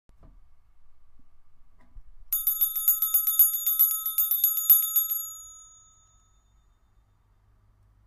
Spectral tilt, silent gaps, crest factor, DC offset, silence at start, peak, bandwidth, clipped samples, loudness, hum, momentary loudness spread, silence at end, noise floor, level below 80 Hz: 3 dB/octave; none; 24 dB; under 0.1%; 0.75 s; -4 dBFS; 16 kHz; under 0.1%; -21 LUFS; none; 11 LU; 2.45 s; -63 dBFS; -58 dBFS